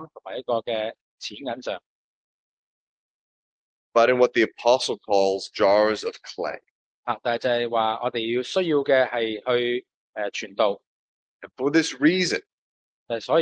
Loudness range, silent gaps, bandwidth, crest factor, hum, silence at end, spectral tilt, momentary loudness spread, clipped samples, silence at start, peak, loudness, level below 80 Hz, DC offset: 9 LU; 1.01-1.18 s, 1.86-3.92 s, 6.70-7.03 s, 9.94-10.13 s, 10.87-11.40 s, 12.52-13.06 s; 9.6 kHz; 20 dB; none; 0 s; -4 dB/octave; 13 LU; under 0.1%; 0 s; -4 dBFS; -24 LUFS; -72 dBFS; under 0.1%